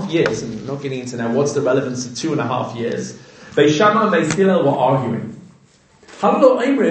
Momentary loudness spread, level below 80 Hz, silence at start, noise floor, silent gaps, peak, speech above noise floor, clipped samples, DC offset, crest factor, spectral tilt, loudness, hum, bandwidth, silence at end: 12 LU; -58 dBFS; 0 s; -51 dBFS; none; 0 dBFS; 35 dB; under 0.1%; under 0.1%; 18 dB; -5.5 dB/octave; -17 LUFS; none; 9 kHz; 0 s